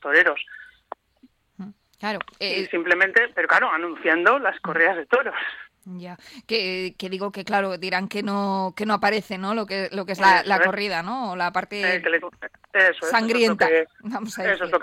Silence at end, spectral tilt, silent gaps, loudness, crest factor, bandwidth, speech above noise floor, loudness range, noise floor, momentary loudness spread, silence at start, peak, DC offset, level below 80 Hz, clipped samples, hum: 0 s; -4.5 dB/octave; none; -22 LUFS; 18 dB; 16 kHz; 36 dB; 5 LU; -59 dBFS; 21 LU; 0 s; -4 dBFS; under 0.1%; -66 dBFS; under 0.1%; none